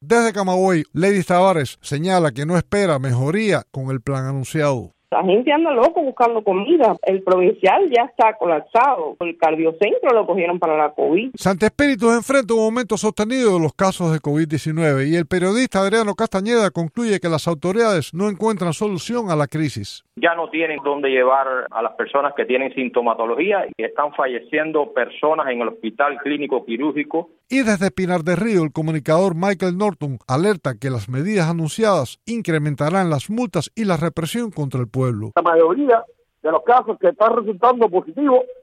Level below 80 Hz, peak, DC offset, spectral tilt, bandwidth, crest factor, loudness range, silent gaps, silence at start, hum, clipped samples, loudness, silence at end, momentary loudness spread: -54 dBFS; -2 dBFS; under 0.1%; -6 dB/octave; 14.5 kHz; 16 dB; 4 LU; none; 0 s; none; under 0.1%; -19 LUFS; 0.1 s; 7 LU